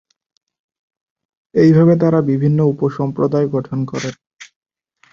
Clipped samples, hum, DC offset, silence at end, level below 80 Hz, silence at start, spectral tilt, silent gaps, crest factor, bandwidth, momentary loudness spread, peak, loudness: under 0.1%; none; under 0.1%; 0.7 s; -54 dBFS; 1.55 s; -8.5 dB/octave; none; 16 dB; 7.4 kHz; 12 LU; -2 dBFS; -15 LUFS